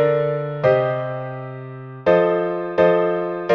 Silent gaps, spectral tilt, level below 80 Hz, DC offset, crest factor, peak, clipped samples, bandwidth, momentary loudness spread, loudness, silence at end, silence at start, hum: none; -8.5 dB/octave; -58 dBFS; under 0.1%; 16 dB; -4 dBFS; under 0.1%; 6.2 kHz; 15 LU; -19 LUFS; 0 s; 0 s; none